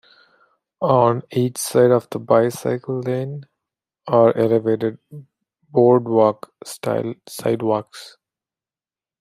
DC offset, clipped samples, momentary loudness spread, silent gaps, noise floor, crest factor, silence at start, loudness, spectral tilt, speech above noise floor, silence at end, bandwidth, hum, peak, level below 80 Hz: under 0.1%; under 0.1%; 16 LU; none; under -90 dBFS; 18 dB; 0.8 s; -19 LUFS; -6.5 dB/octave; over 72 dB; 1.1 s; 15.5 kHz; none; -2 dBFS; -64 dBFS